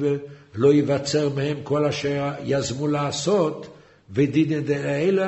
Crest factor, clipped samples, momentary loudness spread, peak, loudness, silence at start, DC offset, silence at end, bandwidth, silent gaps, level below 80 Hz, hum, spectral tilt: 16 dB; under 0.1%; 7 LU; -6 dBFS; -23 LUFS; 0 s; under 0.1%; 0 s; 8.2 kHz; none; -56 dBFS; none; -6 dB/octave